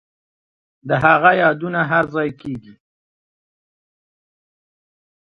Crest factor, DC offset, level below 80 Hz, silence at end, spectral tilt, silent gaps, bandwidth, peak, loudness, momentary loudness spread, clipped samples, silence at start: 20 dB; under 0.1%; -56 dBFS; 2.55 s; -8 dB/octave; none; 6.6 kHz; 0 dBFS; -16 LUFS; 18 LU; under 0.1%; 0.85 s